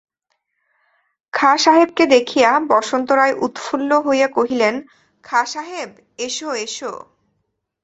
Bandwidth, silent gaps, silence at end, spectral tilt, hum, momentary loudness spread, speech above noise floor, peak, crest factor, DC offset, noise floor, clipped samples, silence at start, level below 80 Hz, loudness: 8.2 kHz; none; 0.85 s; -2.5 dB/octave; none; 16 LU; 55 dB; 0 dBFS; 18 dB; under 0.1%; -72 dBFS; under 0.1%; 1.35 s; -64 dBFS; -17 LUFS